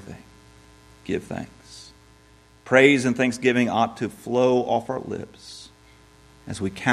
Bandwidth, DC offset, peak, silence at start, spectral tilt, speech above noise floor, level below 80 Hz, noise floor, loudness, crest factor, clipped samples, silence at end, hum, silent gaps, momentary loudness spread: 13 kHz; under 0.1%; 0 dBFS; 0 s; -5 dB/octave; 31 dB; -58 dBFS; -54 dBFS; -22 LUFS; 24 dB; under 0.1%; 0 s; none; none; 25 LU